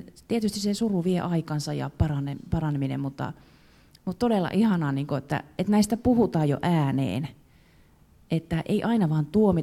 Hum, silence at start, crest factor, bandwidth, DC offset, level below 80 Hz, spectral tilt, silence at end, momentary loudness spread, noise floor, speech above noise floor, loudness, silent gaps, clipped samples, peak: none; 0 s; 16 dB; 15.5 kHz; under 0.1%; -48 dBFS; -7 dB/octave; 0 s; 9 LU; -57 dBFS; 32 dB; -26 LUFS; none; under 0.1%; -10 dBFS